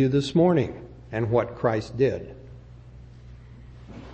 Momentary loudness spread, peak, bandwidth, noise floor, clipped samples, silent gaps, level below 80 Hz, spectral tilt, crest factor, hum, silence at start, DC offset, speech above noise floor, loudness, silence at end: 26 LU; -8 dBFS; 8.8 kHz; -45 dBFS; under 0.1%; none; -48 dBFS; -7.5 dB/octave; 18 dB; none; 0 s; under 0.1%; 22 dB; -24 LUFS; 0 s